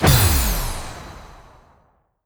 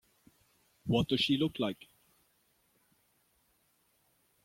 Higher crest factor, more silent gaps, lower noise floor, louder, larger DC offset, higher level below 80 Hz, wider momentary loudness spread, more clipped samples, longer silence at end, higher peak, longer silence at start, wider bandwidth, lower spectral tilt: about the same, 18 dB vs 22 dB; neither; second, -60 dBFS vs -73 dBFS; first, -19 LUFS vs -31 LUFS; neither; first, -26 dBFS vs -64 dBFS; first, 24 LU vs 14 LU; neither; second, 0.9 s vs 2.7 s; first, -2 dBFS vs -16 dBFS; second, 0 s vs 0.85 s; first, over 20 kHz vs 16.5 kHz; second, -4 dB/octave vs -6 dB/octave